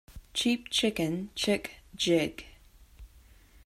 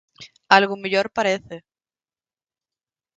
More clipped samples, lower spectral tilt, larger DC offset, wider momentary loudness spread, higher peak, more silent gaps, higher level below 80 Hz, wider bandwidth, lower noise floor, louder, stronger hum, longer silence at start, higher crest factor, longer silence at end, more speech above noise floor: neither; about the same, -4 dB/octave vs -4 dB/octave; neither; second, 9 LU vs 20 LU; second, -14 dBFS vs 0 dBFS; neither; first, -54 dBFS vs -66 dBFS; first, 15.5 kHz vs 9.2 kHz; second, -57 dBFS vs under -90 dBFS; second, -29 LUFS vs -19 LUFS; neither; about the same, 0.1 s vs 0.2 s; second, 18 dB vs 24 dB; second, 0.6 s vs 1.6 s; second, 27 dB vs over 70 dB